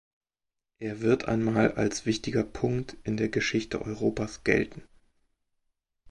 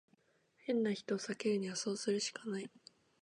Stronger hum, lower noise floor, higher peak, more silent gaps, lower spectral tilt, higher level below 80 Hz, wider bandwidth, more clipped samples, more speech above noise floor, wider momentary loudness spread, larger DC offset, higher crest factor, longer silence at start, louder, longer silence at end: neither; first, -88 dBFS vs -73 dBFS; first, -8 dBFS vs -24 dBFS; neither; first, -5.5 dB/octave vs -4 dB/octave; first, -52 dBFS vs -88 dBFS; about the same, 11.5 kHz vs 11 kHz; neither; first, 61 dB vs 36 dB; about the same, 8 LU vs 8 LU; neither; first, 22 dB vs 16 dB; first, 0.8 s vs 0.65 s; first, -28 LUFS vs -38 LUFS; second, 0 s vs 0.55 s